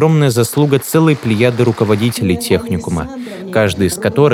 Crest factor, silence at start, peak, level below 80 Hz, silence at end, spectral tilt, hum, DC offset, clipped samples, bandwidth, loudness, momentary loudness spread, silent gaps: 14 dB; 0 s; 0 dBFS; -42 dBFS; 0 s; -6 dB/octave; none; under 0.1%; under 0.1%; 17.5 kHz; -14 LUFS; 7 LU; none